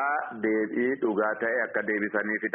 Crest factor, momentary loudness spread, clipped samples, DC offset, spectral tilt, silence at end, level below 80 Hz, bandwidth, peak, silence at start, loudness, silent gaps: 16 dB; 2 LU; under 0.1%; under 0.1%; 0.5 dB/octave; 0.05 s; -72 dBFS; 3.6 kHz; -12 dBFS; 0 s; -27 LUFS; none